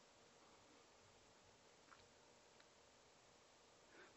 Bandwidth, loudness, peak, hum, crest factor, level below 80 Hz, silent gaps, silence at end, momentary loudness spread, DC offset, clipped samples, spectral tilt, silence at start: 8 kHz; -69 LUFS; -48 dBFS; none; 22 dB; -88 dBFS; none; 0 s; 2 LU; under 0.1%; under 0.1%; -2 dB/octave; 0 s